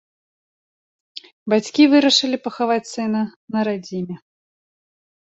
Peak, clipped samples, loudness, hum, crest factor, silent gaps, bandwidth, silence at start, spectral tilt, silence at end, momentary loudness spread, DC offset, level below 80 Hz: -2 dBFS; under 0.1%; -19 LUFS; none; 18 dB; 1.33-1.46 s, 3.36-3.48 s; 8.2 kHz; 1.15 s; -4 dB/octave; 1.15 s; 22 LU; under 0.1%; -68 dBFS